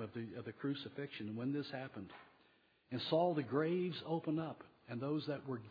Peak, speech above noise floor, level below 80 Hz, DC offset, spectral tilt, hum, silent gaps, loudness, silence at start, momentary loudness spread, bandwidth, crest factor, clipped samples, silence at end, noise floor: -22 dBFS; 32 dB; -84 dBFS; under 0.1%; -5.5 dB/octave; none; none; -41 LUFS; 0 s; 14 LU; 5 kHz; 20 dB; under 0.1%; 0 s; -72 dBFS